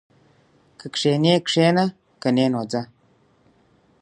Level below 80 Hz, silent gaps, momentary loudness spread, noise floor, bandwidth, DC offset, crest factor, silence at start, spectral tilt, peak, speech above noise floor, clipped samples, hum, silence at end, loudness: -66 dBFS; none; 12 LU; -60 dBFS; 11 kHz; under 0.1%; 20 dB; 0.8 s; -5.5 dB/octave; -4 dBFS; 40 dB; under 0.1%; none; 1.15 s; -21 LUFS